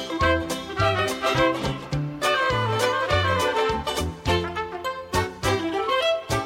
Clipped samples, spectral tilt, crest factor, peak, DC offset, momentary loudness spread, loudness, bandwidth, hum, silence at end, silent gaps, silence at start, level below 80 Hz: under 0.1%; -4.5 dB/octave; 16 dB; -8 dBFS; under 0.1%; 7 LU; -24 LUFS; 16.5 kHz; none; 0 s; none; 0 s; -40 dBFS